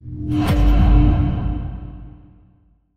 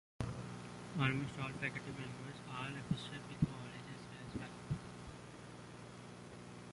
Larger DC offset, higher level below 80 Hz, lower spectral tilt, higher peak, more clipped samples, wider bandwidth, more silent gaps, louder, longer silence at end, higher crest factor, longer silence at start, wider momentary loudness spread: neither; first, -20 dBFS vs -62 dBFS; first, -8.5 dB/octave vs -6 dB/octave; first, -4 dBFS vs -20 dBFS; neither; second, 9.2 kHz vs 11.5 kHz; neither; first, -18 LUFS vs -44 LUFS; first, 0.8 s vs 0 s; second, 14 dB vs 26 dB; second, 0.05 s vs 0.2 s; first, 20 LU vs 15 LU